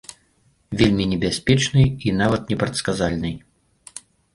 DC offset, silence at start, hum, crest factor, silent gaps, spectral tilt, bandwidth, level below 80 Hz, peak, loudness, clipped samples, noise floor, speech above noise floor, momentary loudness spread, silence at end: under 0.1%; 0.1 s; none; 20 dB; none; -5.5 dB/octave; 11.5 kHz; -42 dBFS; -2 dBFS; -20 LUFS; under 0.1%; -61 dBFS; 42 dB; 21 LU; 0.35 s